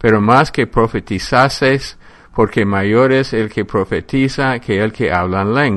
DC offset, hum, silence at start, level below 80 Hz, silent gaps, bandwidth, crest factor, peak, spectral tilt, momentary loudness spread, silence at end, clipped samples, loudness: under 0.1%; none; 0 s; -36 dBFS; none; 12 kHz; 14 dB; 0 dBFS; -6.5 dB/octave; 7 LU; 0 s; under 0.1%; -15 LUFS